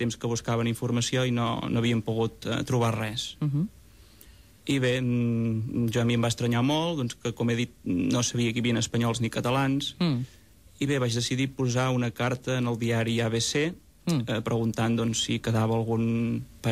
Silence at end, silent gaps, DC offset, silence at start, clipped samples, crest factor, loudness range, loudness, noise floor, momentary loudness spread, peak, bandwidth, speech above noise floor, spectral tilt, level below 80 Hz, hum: 0 s; none; under 0.1%; 0 s; under 0.1%; 14 dB; 2 LU; -27 LUFS; -53 dBFS; 5 LU; -14 dBFS; 14.5 kHz; 26 dB; -5.5 dB/octave; -54 dBFS; none